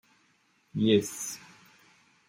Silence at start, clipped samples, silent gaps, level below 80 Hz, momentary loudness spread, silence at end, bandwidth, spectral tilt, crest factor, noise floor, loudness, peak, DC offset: 0.75 s; under 0.1%; none; -72 dBFS; 15 LU; 0.9 s; 16.5 kHz; -4.5 dB/octave; 22 dB; -68 dBFS; -28 LUFS; -10 dBFS; under 0.1%